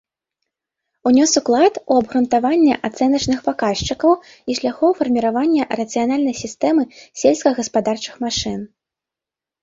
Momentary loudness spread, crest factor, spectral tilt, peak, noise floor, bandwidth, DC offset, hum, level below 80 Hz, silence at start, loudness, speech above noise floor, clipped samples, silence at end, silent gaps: 8 LU; 16 dB; -4 dB/octave; -2 dBFS; -88 dBFS; 7.8 kHz; under 0.1%; none; -48 dBFS; 1.05 s; -18 LUFS; 71 dB; under 0.1%; 0.95 s; none